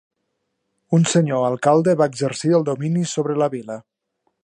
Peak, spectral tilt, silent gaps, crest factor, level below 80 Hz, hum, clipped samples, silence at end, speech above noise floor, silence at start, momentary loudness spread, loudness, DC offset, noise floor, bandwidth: -2 dBFS; -6 dB/octave; none; 18 dB; -68 dBFS; none; under 0.1%; 0.65 s; 56 dB; 0.9 s; 7 LU; -19 LUFS; under 0.1%; -74 dBFS; 10.5 kHz